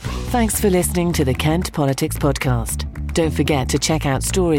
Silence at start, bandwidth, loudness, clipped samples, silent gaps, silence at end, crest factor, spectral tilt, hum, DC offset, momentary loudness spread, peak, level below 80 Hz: 0 s; 17 kHz; -19 LUFS; under 0.1%; none; 0 s; 14 dB; -5 dB/octave; none; under 0.1%; 5 LU; -6 dBFS; -28 dBFS